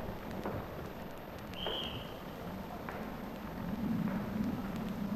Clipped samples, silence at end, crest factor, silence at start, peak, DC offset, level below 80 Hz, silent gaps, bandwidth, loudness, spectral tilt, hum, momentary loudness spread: under 0.1%; 0 s; 16 dB; 0 s; -24 dBFS; under 0.1%; -54 dBFS; none; 14 kHz; -40 LUFS; -6.5 dB/octave; none; 9 LU